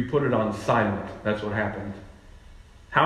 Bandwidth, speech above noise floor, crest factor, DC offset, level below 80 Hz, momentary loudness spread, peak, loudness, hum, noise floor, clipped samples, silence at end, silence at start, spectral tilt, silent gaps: 12.5 kHz; 22 dB; 20 dB; under 0.1%; -50 dBFS; 13 LU; -6 dBFS; -26 LUFS; none; -48 dBFS; under 0.1%; 0 s; 0 s; -7 dB/octave; none